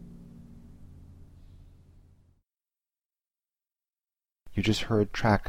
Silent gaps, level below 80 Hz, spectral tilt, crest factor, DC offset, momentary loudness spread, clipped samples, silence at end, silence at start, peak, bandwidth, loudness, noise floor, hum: none; -48 dBFS; -6 dB/octave; 24 dB; under 0.1%; 26 LU; under 0.1%; 0 s; 0 s; -10 dBFS; 15.5 kHz; -28 LUFS; under -90 dBFS; none